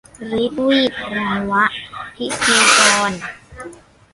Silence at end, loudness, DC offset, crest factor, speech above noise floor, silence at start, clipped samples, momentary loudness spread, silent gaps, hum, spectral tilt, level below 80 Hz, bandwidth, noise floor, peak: 0.4 s; -15 LUFS; under 0.1%; 18 dB; 22 dB; 0.2 s; under 0.1%; 22 LU; none; none; -2 dB/octave; -50 dBFS; 11.5 kHz; -39 dBFS; 0 dBFS